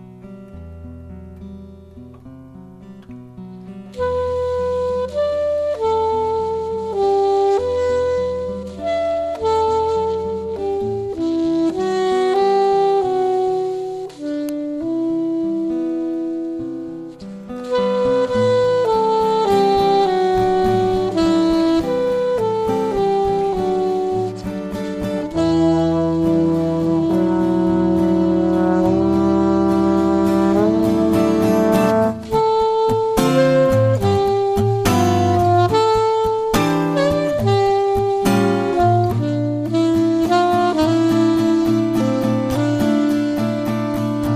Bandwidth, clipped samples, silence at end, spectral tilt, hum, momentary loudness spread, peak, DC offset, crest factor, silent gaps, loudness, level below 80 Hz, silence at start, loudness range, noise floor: 15.5 kHz; under 0.1%; 0 s; -7 dB/octave; none; 10 LU; -2 dBFS; under 0.1%; 16 dB; none; -18 LUFS; -42 dBFS; 0 s; 7 LU; -39 dBFS